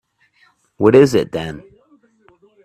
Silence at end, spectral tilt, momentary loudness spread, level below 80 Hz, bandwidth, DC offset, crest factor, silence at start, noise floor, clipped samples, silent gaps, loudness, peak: 1.05 s; -6.5 dB/octave; 19 LU; -52 dBFS; 14 kHz; under 0.1%; 18 dB; 0.8 s; -57 dBFS; under 0.1%; none; -14 LUFS; 0 dBFS